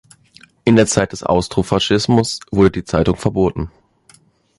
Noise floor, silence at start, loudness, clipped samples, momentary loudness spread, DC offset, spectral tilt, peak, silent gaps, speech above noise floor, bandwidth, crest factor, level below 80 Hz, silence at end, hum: -52 dBFS; 0.65 s; -16 LUFS; under 0.1%; 6 LU; under 0.1%; -5.5 dB/octave; -2 dBFS; none; 36 dB; 11.5 kHz; 16 dB; -36 dBFS; 0.9 s; none